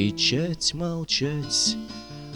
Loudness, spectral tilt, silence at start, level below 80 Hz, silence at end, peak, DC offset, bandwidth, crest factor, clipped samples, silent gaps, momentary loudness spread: -24 LUFS; -3.5 dB/octave; 0 s; -50 dBFS; 0 s; -10 dBFS; 0.1%; 19 kHz; 16 dB; under 0.1%; none; 11 LU